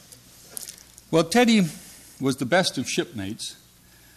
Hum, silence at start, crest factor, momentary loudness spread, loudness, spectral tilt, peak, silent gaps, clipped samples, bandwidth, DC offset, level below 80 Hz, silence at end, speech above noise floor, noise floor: 60 Hz at -50 dBFS; 0.5 s; 16 dB; 20 LU; -23 LUFS; -4.5 dB/octave; -8 dBFS; none; under 0.1%; 14 kHz; under 0.1%; -62 dBFS; 0.65 s; 31 dB; -53 dBFS